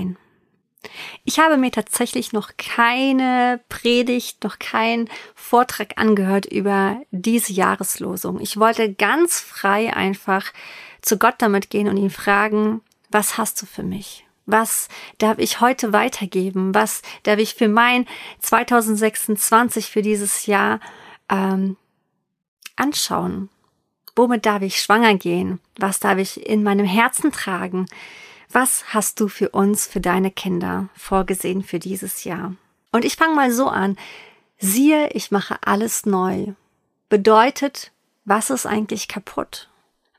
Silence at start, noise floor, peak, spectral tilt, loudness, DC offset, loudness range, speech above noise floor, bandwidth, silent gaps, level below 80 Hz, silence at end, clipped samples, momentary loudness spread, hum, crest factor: 0 s; -72 dBFS; -2 dBFS; -4 dB/octave; -19 LUFS; under 0.1%; 3 LU; 53 dB; 15.5 kHz; 22.48-22.57 s; -52 dBFS; 0.55 s; under 0.1%; 13 LU; none; 18 dB